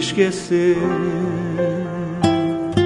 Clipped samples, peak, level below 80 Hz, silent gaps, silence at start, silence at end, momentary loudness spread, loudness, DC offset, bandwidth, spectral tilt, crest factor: under 0.1%; -2 dBFS; -48 dBFS; none; 0 s; 0 s; 5 LU; -20 LUFS; under 0.1%; 11 kHz; -6 dB/octave; 16 dB